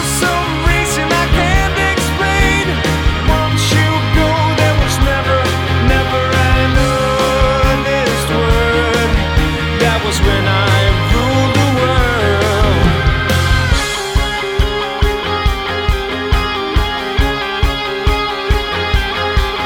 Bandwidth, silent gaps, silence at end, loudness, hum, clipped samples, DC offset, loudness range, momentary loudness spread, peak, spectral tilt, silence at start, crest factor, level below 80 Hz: 18.5 kHz; none; 0 s; -14 LUFS; none; under 0.1%; under 0.1%; 3 LU; 4 LU; 0 dBFS; -5 dB/octave; 0 s; 12 dB; -18 dBFS